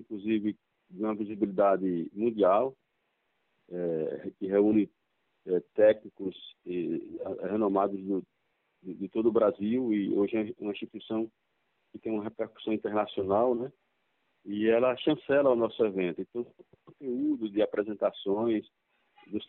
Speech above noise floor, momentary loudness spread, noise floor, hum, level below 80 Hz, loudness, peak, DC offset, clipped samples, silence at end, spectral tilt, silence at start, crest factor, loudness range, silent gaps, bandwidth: 48 dB; 14 LU; -77 dBFS; none; -72 dBFS; -30 LUFS; -12 dBFS; under 0.1%; under 0.1%; 0.05 s; -5.5 dB/octave; 0 s; 18 dB; 4 LU; none; 4.1 kHz